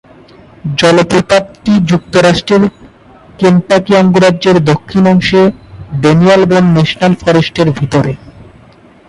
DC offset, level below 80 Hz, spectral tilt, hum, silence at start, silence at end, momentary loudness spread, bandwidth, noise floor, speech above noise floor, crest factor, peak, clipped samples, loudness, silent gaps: under 0.1%; -38 dBFS; -6.5 dB/octave; none; 0.65 s; 0.65 s; 6 LU; 11.5 kHz; -40 dBFS; 32 dB; 10 dB; 0 dBFS; under 0.1%; -9 LUFS; none